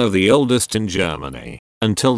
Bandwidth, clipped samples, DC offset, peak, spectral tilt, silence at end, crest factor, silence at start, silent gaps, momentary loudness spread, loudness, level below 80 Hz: 11 kHz; under 0.1%; under 0.1%; -2 dBFS; -4.5 dB/octave; 0 s; 16 dB; 0 s; 1.59-1.81 s; 18 LU; -17 LUFS; -44 dBFS